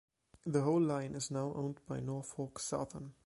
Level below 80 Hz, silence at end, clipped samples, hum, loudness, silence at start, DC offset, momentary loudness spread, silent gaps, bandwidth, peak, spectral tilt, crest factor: -68 dBFS; 0.15 s; under 0.1%; none; -38 LUFS; 0.45 s; under 0.1%; 10 LU; none; 11.5 kHz; -20 dBFS; -6 dB/octave; 18 dB